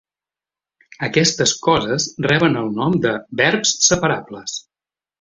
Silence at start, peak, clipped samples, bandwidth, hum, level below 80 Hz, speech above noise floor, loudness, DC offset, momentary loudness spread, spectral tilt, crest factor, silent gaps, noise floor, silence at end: 1 s; -2 dBFS; under 0.1%; 8.2 kHz; none; -50 dBFS; over 72 dB; -17 LUFS; under 0.1%; 13 LU; -3 dB/octave; 18 dB; none; under -90 dBFS; 0.6 s